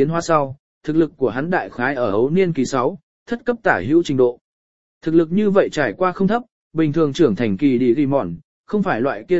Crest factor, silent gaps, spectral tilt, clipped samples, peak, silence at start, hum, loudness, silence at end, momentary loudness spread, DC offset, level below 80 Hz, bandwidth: 18 dB; 0.59-0.81 s, 3.03-3.26 s, 4.41-5.01 s, 6.52-6.71 s, 8.44-8.64 s; -7 dB/octave; under 0.1%; 0 dBFS; 0 s; none; -19 LUFS; 0 s; 9 LU; 1%; -52 dBFS; 8 kHz